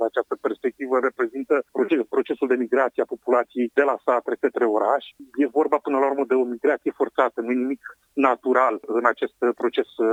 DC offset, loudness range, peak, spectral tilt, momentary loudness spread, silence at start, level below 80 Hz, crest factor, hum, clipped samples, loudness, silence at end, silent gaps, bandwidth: under 0.1%; 1 LU; -4 dBFS; -5.5 dB/octave; 5 LU; 0 s; -74 dBFS; 20 dB; none; under 0.1%; -23 LUFS; 0 s; none; 9 kHz